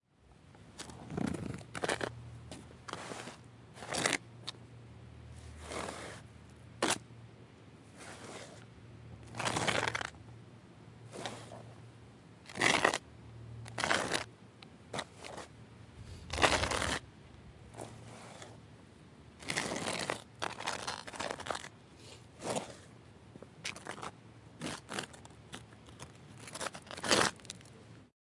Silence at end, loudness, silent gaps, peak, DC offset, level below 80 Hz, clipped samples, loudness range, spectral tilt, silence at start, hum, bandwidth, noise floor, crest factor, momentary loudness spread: 0.25 s; -36 LUFS; none; -8 dBFS; under 0.1%; -60 dBFS; under 0.1%; 9 LU; -2.5 dB/octave; 0.2 s; none; 11.5 kHz; -62 dBFS; 32 dB; 24 LU